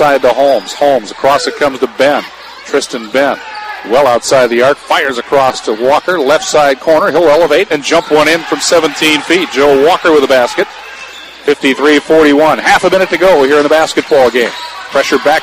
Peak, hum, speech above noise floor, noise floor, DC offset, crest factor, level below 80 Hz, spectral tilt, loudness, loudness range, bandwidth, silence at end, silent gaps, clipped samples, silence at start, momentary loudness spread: 0 dBFS; none; 20 dB; -29 dBFS; under 0.1%; 10 dB; -44 dBFS; -3 dB/octave; -9 LUFS; 3 LU; 15.5 kHz; 0 s; none; under 0.1%; 0 s; 8 LU